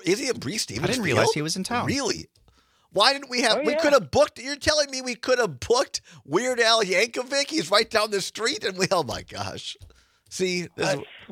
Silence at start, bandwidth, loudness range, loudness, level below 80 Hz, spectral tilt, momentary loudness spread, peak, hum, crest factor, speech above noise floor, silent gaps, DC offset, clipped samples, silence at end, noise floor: 0 s; 16 kHz; 3 LU; -23 LUFS; -56 dBFS; -3 dB/octave; 12 LU; -4 dBFS; none; 22 dB; 37 dB; none; under 0.1%; under 0.1%; 0.05 s; -61 dBFS